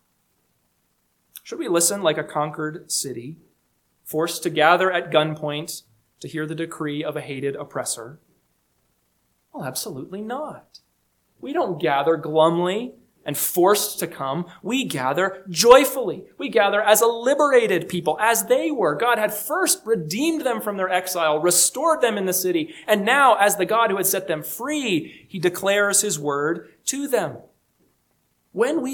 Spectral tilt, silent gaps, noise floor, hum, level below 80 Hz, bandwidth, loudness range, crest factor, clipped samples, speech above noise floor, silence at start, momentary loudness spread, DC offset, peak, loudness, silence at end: -3 dB/octave; none; -69 dBFS; 60 Hz at -60 dBFS; -66 dBFS; 19 kHz; 11 LU; 22 dB; under 0.1%; 47 dB; 1.35 s; 14 LU; under 0.1%; 0 dBFS; -21 LUFS; 0 s